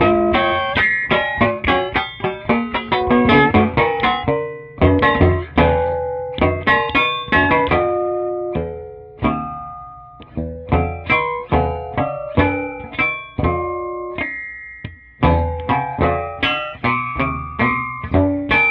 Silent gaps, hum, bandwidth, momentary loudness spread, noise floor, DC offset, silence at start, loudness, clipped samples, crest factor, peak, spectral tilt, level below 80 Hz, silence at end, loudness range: none; none; 5.6 kHz; 13 LU; -38 dBFS; under 0.1%; 0 s; -18 LUFS; under 0.1%; 18 dB; 0 dBFS; -8.5 dB/octave; -32 dBFS; 0 s; 6 LU